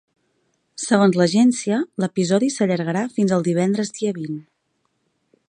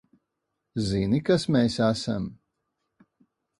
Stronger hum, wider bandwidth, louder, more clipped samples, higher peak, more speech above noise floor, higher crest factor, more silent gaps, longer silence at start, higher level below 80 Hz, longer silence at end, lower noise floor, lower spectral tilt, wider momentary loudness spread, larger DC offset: neither; about the same, 10.5 kHz vs 11.5 kHz; first, -20 LUFS vs -25 LUFS; neither; first, -2 dBFS vs -8 dBFS; second, 52 dB vs 57 dB; about the same, 20 dB vs 18 dB; neither; about the same, 0.8 s vs 0.75 s; second, -66 dBFS vs -52 dBFS; second, 1.05 s vs 1.25 s; second, -70 dBFS vs -81 dBFS; about the same, -5.5 dB/octave vs -6.5 dB/octave; about the same, 13 LU vs 11 LU; neither